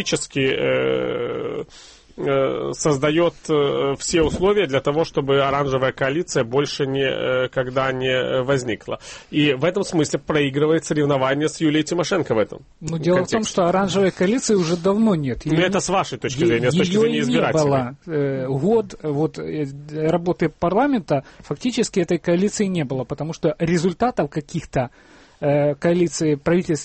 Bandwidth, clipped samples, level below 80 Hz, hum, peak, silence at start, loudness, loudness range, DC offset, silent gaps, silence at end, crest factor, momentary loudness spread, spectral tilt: 8.8 kHz; under 0.1%; -46 dBFS; none; -8 dBFS; 0 s; -20 LUFS; 3 LU; under 0.1%; none; 0 s; 14 dB; 8 LU; -5.5 dB/octave